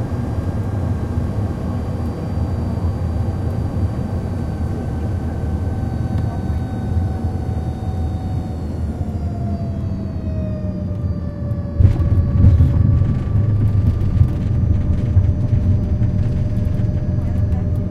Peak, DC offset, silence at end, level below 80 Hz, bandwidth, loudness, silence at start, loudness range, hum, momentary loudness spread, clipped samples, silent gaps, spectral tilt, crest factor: -2 dBFS; under 0.1%; 0 s; -26 dBFS; 6.4 kHz; -20 LUFS; 0 s; 7 LU; none; 8 LU; under 0.1%; none; -9.5 dB/octave; 16 dB